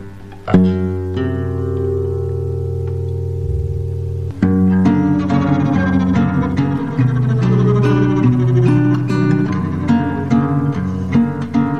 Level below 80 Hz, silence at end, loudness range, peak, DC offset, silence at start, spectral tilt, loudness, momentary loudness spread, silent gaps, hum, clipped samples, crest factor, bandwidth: -36 dBFS; 0 s; 6 LU; 0 dBFS; 1%; 0 s; -9.5 dB/octave; -16 LUFS; 8 LU; none; none; under 0.1%; 14 dB; 7.6 kHz